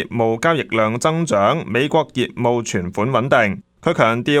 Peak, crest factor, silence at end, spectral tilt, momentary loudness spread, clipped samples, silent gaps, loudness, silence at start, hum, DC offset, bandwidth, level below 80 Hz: 0 dBFS; 18 dB; 0 s; -5.5 dB/octave; 5 LU; under 0.1%; none; -18 LUFS; 0 s; none; under 0.1%; 15 kHz; -54 dBFS